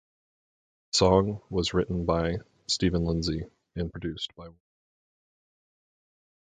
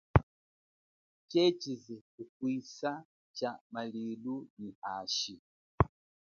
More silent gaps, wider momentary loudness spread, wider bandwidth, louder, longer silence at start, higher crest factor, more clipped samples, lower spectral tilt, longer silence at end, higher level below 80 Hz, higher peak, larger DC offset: second, none vs 0.23-1.28 s, 2.01-2.18 s, 2.29-2.40 s, 3.05-3.34 s, 3.61-3.70 s, 4.50-4.57 s, 4.75-4.82 s, 5.39-5.78 s; second, 14 LU vs 17 LU; first, 9.6 kHz vs 7.2 kHz; first, -28 LUFS vs -35 LUFS; first, 0.95 s vs 0.15 s; second, 24 dB vs 32 dB; neither; about the same, -5 dB/octave vs -5 dB/octave; first, 1.9 s vs 0.35 s; about the same, -44 dBFS vs -48 dBFS; about the same, -6 dBFS vs -4 dBFS; neither